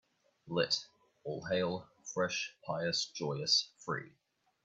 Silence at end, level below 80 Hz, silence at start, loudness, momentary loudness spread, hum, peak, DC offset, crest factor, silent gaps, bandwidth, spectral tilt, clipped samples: 0.55 s; -76 dBFS; 0.45 s; -35 LUFS; 13 LU; none; -18 dBFS; under 0.1%; 20 dB; none; 8.6 kHz; -3 dB/octave; under 0.1%